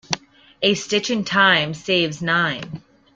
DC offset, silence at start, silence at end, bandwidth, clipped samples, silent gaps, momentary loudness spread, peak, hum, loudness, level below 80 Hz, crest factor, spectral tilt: under 0.1%; 0.1 s; 0.35 s; 9.4 kHz; under 0.1%; none; 13 LU; -2 dBFS; none; -19 LUFS; -58 dBFS; 20 dB; -3.5 dB/octave